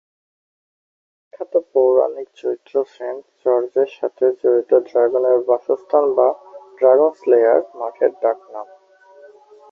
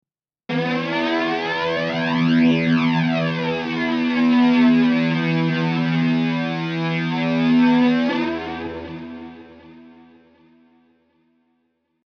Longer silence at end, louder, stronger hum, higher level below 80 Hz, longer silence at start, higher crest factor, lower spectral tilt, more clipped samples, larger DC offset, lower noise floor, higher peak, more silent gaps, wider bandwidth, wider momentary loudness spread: second, 1.1 s vs 2.15 s; about the same, -18 LUFS vs -19 LUFS; neither; second, -72 dBFS vs -60 dBFS; first, 1.35 s vs 0.5 s; about the same, 16 dB vs 14 dB; about the same, -7 dB/octave vs -7.5 dB/octave; neither; neither; second, -48 dBFS vs -70 dBFS; first, -2 dBFS vs -6 dBFS; neither; second, 5.8 kHz vs 6.4 kHz; about the same, 13 LU vs 12 LU